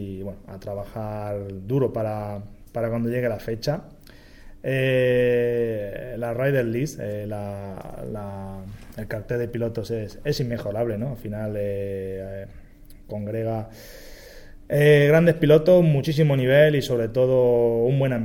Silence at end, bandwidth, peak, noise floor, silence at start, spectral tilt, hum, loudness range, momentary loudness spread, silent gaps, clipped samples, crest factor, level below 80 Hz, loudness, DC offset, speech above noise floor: 0 s; 17 kHz; -4 dBFS; -44 dBFS; 0 s; -7.5 dB/octave; none; 12 LU; 19 LU; none; under 0.1%; 20 dB; -46 dBFS; -23 LUFS; under 0.1%; 22 dB